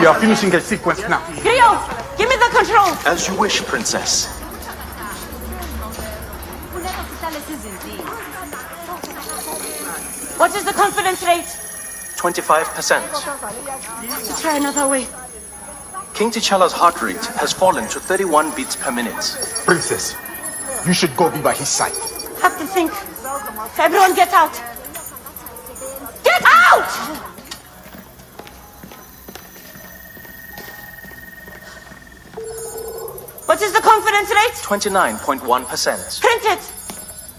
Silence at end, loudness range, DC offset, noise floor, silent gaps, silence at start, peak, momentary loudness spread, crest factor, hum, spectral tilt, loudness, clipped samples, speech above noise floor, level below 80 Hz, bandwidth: 0 s; 17 LU; under 0.1%; -40 dBFS; none; 0 s; 0 dBFS; 21 LU; 18 dB; none; -2.5 dB/octave; -17 LUFS; under 0.1%; 23 dB; -42 dBFS; 16 kHz